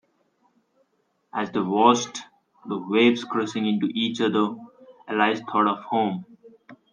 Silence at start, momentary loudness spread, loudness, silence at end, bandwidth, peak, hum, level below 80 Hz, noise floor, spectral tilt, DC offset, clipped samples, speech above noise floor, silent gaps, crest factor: 1.35 s; 14 LU; -23 LUFS; 0.2 s; 9.8 kHz; -4 dBFS; none; -74 dBFS; -70 dBFS; -4.5 dB/octave; under 0.1%; under 0.1%; 48 dB; none; 22 dB